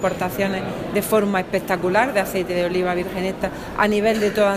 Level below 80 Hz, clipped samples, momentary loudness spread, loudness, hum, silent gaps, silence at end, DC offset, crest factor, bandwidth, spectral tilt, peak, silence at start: -44 dBFS; under 0.1%; 6 LU; -21 LUFS; none; none; 0 s; under 0.1%; 18 dB; 15.5 kHz; -5 dB/octave; -2 dBFS; 0 s